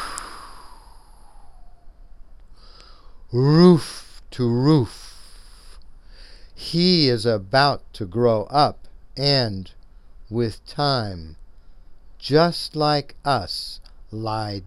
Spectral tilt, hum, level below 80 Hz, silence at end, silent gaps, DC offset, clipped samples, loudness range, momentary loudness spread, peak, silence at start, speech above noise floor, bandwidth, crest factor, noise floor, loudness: -6.5 dB/octave; none; -44 dBFS; 0 s; none; under 0.1%; under 0.1%; 5 LU; 21 LU; 0 dBFS; 0 s; 25 dB; 12.5 kHz; 22 dB; -44 dBFS; -20 LUFS